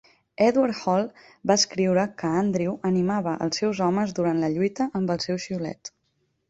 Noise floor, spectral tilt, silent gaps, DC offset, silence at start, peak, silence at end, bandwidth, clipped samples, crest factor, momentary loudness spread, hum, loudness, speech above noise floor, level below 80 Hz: -72 dBFS; -5 dB/octave; none; under 0.1%; 0.4 s; -6 dBFS; 0.6 s; 8 kHz; under 0.1%; 18 dB; 10 LU; none; -24 LUFS; 48 dB; -62 dBFS